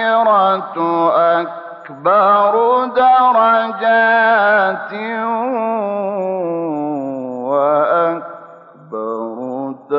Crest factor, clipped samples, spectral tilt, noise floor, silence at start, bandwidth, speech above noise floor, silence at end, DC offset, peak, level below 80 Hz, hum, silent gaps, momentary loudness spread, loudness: 12 dB; under 0.1%; -8 dB/octave; -39 dBFS; 0 s; 5.6 kHz; 25 dB; 0 s; under 0.1%; -2 dBFS; -70 dBFS; none; none; 13 LU; -15 LUFS